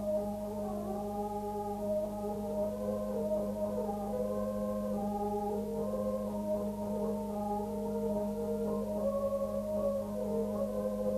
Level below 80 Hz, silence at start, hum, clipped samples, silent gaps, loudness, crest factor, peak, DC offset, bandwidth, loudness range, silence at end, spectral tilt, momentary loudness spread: -54 dBFS; 0 s; none; under 0.1%; none; -35 LUFS; 12 dB; -22 dBFS; under 0.1%; 14 kHz; 1 LU; 0 s; -8 dB/octave; 3 LU